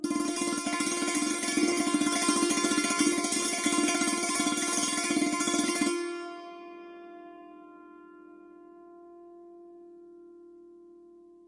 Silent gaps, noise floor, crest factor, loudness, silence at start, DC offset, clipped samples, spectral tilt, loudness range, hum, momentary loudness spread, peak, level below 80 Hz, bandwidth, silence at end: none; -54 dBFS; 20 dB; -27 LUFS; 0 s; under 0.1%; under 0.1%; -1.5 dB/octave; 16 LU; none; 20 LU; -12 dBFS; -72 dBFS; 11.5 kHz; 0.55 s